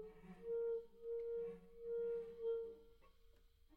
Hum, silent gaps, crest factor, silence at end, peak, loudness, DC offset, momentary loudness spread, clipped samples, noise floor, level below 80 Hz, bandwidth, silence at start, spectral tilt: none; none; 12 dB; 0 s; -36 dBFS; -47 LUFS; under 0.1%; 11 LU; under 0.1%; -68 dBFS; -70 dBFS; 4.4 kHz; 0 s; -7.5 dB/octave